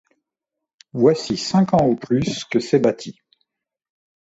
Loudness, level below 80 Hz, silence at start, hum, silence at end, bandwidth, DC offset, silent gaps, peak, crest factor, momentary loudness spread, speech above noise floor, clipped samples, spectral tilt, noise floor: -19 LUFS; -52 dBFS; 0.95 s; none; 1.15 s; 8 kHz; under 0.1%; none; -2 dBFS; 18 dB; 11 LU; 65 dB; under 0.1%; -6 dB/octave; -84 dBFS